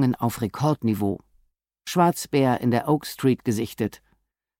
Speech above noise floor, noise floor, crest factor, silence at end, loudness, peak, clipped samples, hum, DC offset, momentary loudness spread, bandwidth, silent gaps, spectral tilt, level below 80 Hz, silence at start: 47 dB; -70 dBFS; 16 dB; 0.7 s; -24 LUFS; -8 dBFS; under 0.1%; none; under 0.1%; 8 LU; 17 kHz; none; -6.5 dB/octave; -58 dBFS; 0 s